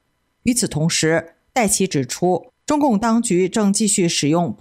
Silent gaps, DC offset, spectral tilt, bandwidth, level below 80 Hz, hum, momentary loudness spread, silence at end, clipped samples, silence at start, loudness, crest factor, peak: none; under 0.1%; -4 dB/octave; 16 kHz; -50 dBFS; none; 6 LU; 0.05 s; under 0.1%; 0.45 s; -18 LUFS; 12 dB; -6 dBFS